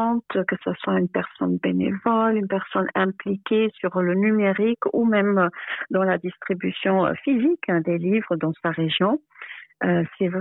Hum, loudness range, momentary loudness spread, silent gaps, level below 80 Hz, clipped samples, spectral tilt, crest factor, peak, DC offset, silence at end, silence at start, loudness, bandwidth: none; 2 LU; 6 LU; none; -66 dBFS; under 0.1%; -11 dB/octave; 14 dB; -8 dBFS; under 0.1%; 0 s; 0 s; -23 LUFS; 4.1 kHz